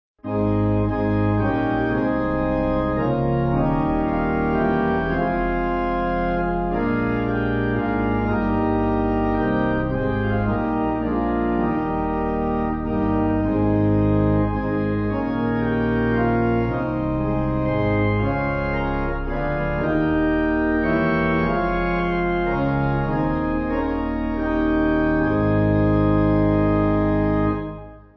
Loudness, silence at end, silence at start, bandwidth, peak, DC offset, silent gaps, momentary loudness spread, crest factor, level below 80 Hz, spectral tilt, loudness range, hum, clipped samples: -21 LUFS; 0.2 s; 0.25 s; 6 kHz; -8 dBFS; under 0.1%; none; 4 LU; 12 dB; -32 dBFS; -10.5 dB/octave; 2 LU; none; under 0.1%